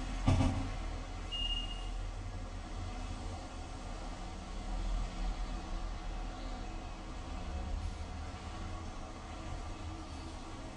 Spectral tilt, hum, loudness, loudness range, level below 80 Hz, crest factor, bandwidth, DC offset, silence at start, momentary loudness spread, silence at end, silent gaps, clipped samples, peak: -5 dB/octave; none; -42 LUFS; 5 LU; -42 dBFS; 22 dB; 10.5 kHz; under 0.1%; 0 s; 10 LU; 0 s; none; under 0.1%; -16 dBFS